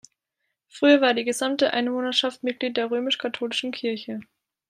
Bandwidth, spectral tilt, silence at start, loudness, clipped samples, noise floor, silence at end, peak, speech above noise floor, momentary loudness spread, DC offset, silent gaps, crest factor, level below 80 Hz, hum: 15 kHz; -2.5 dB/octave; 0.75 s; -23 LUFS; under 0.1%; -80 dBFS; 0.45 s; -6 dBFS; 56 dB; 11 LU; under 0.1%; none; 20 dB; -78 dBFS; none